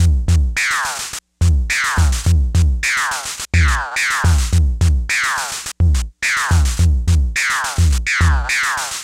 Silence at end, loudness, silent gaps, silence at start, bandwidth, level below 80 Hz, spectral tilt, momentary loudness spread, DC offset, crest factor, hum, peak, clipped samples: 0 s; -16 LUFS; none; 0 s; 16 kHz; -20 dBFS; -3.5 dB/octave; 4 LU; under 0.1%; 10 dB; none; -4 dBFS; under 0.1%